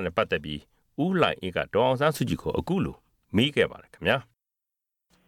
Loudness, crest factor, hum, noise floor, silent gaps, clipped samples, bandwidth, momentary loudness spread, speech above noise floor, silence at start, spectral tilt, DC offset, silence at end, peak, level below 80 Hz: -26 LUFS; 20 dB; none; -87 dBFS; none; under 0.1%; 17 kHz; 7 LU; 61 dB; 0 s; -6 dB/octave; under 0.1%; 1.05 s; -6 dBFS; -52 dBFS